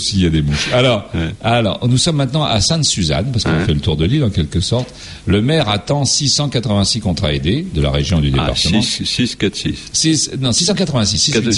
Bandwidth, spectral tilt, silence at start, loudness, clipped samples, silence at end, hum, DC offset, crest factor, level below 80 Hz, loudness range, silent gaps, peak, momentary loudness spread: 11.5 kHz; -4.5 dB/octave; 0 s; -15 LUFS; under 0.1%; 0 s; none; under 0.1%; 12 dB; -30 dBFS; 1 LU; none; -2 dBFS; 5 LU